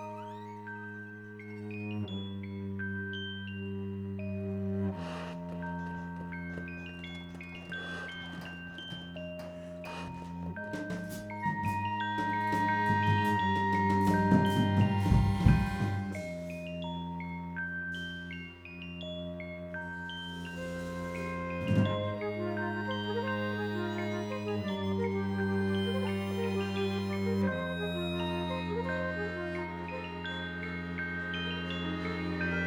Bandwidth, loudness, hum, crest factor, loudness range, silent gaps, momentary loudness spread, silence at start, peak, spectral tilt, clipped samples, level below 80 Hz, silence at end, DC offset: 16.5 kHz; -34 LUFS; none; 24 dB; 12 LU; none; 14 LU; 0 s; -10 dBFS; -7 dB/octave; under 0.1%; -48 dBFS; 0 s; under 0.1%